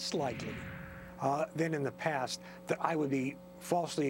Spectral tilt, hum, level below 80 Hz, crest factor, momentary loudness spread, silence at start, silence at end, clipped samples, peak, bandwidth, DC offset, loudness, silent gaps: -5 dB/octave; none; -64 dBFS; 20 dB; 11 LU; 0 s; 0 s; under 0.1%; -14 dBFS; 17 kHz; under 0.1%; -35 LUFS; none